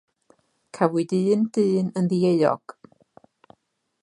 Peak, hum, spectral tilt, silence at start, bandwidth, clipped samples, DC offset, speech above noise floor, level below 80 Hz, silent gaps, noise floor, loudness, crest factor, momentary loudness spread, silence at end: -4 dBFS; none; -7.5 dB/octave; 0.75 s; 10.5 kHz; under 0.1%; under 0.1%; 47 dB; -72 dBFS; none; -69 dBFS; -22 LUFS; 20 dB; 4 LU; 1.45 s